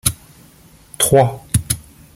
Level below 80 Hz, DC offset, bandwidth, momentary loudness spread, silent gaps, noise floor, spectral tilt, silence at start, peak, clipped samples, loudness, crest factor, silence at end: -38 dBFS; under 0.1%; 17 kHz; 11 LU; none; -47 dBFS; -4 dB/octave; 0.05 s; 0 dBFS; under 0.1%; -17 LUFS; 20 dB; 0.35 s